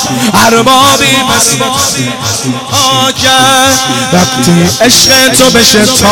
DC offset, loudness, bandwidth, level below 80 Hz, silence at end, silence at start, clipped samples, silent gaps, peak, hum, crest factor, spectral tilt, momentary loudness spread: under 0.1%; -5 LUFS; over 20 kHz; -36 dBFS; 0 s; 0 s; 1%; none; 0 dBFS; none; 6 dB; -2.5 dB/octave; 7 LU